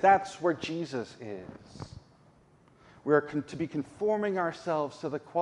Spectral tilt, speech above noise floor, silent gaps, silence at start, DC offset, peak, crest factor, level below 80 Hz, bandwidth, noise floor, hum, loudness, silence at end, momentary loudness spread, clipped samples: -6 dB/octave; 31 dB; none; 0 s; under 0.1%; -10 dBFS; 20 dB; -66 dBFS; 11 kHz; -61 dBFS; none; -31 LUFS; 0 s; 19 LU; under 0.1%